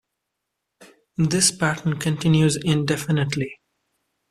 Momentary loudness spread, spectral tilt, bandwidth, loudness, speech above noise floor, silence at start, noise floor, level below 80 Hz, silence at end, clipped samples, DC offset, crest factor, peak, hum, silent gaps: 8 LU; -4.5 dB/octave; 14 kHz; -21 LUFS; 60 dB; 0.8 s; -80 dBFS; -54 dBFS; 0.75 s; under 0.1%; under 0.1%; 20 dB; -2 dBFS; none; none